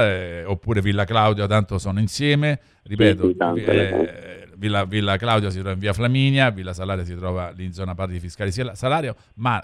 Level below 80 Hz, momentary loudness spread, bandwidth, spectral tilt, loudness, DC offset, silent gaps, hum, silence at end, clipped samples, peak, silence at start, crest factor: -44 dBFS; 11 LU; 12 kHz; -6.5 dB/octave; -22 LUFS; under 0.1%; none; none; 0 s; under 0.1%; -4 dBFS; 0 s; 18 dB